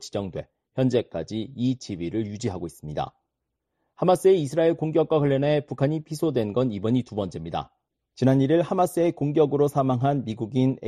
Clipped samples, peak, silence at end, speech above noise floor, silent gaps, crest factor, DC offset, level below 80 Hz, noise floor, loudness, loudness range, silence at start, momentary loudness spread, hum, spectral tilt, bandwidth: under 0.1%; -8 dBFS; 0 s; 57 dB; none; 16 dB; under 0.1%; -56 dBFS; -81 dBFS; -24 LUFS; 6 LU; 0 s; 12 LU; none; -7.5 dB/octave; 13 kHz